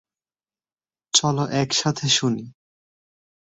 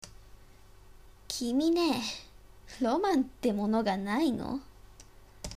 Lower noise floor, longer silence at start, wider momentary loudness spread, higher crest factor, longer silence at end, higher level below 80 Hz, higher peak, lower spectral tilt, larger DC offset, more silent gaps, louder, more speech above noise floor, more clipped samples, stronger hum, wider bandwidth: first, under -90 dBFS vs -55 dBFS; first, 1.15 s vs 0.05 s; second, 6 LU vs 15 LU; first, 24 dB vs 18 dB; first, 0.9 s vs 0 s; second, -62 dBFS vs -54 dBFS; first, -2 dBFS vs -14 dBFS; about the same, -3.5 dB/octave vs -4.5 dB/octave; neither; neither; first, -21 LUFS vs -30 LUFS; first, over 68 dB vs 26 dB; neither; second, none vs 50 Hz at -55 dBFS; second, 8.4 kHz vs 15.5 kHz